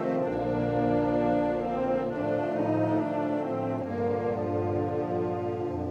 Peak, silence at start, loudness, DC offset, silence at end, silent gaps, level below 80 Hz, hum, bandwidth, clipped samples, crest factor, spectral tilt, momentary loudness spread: -14 dBFS; 0 s; -28 LUFS; under 0.1%; 0 s; none; -54 dBFS; none; 7.8 kHz; under 0.1%; 14 dB; -9 dB/octave; 5 LU